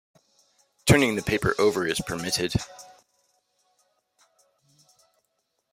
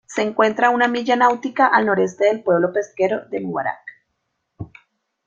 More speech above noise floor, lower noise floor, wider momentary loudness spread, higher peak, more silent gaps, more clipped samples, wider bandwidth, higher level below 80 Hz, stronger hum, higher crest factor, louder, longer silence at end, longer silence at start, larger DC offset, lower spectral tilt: second, 51 dB vs 56 dB; about the same, -76 dBFS vs -74 dBFS; second, 11 LU vs 18 LU; about the same, -4 dBFS vs -2 dBFS; neither; neither; first, 16 kHz vs 8 kHz; first, -48 dBFS vs -60 dBFS; neither; first, 24 dB vs 18 dB; second, -24 LUFS vs -18 LUFS; first, 2.9 s vs 0.6 s; first, 0.85 s vs 0.1 s; neither; about the same, -4.5 dB/octave vs -5 dB/octave